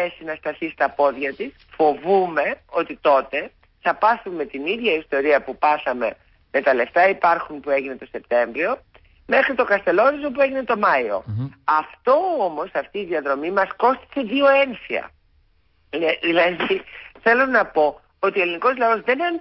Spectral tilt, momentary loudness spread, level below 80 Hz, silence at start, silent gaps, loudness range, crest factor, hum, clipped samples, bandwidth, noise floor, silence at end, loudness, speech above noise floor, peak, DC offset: -9.5 dB/octave; 10 LU; -58 dBFS; 0 s; none; 2 LU; 14 dB; none; under 0.1%; 5.8 kHz; -61 dBFS; 0 s; -20 LUFS; 41 dB; -6 dBFS; under 0.1%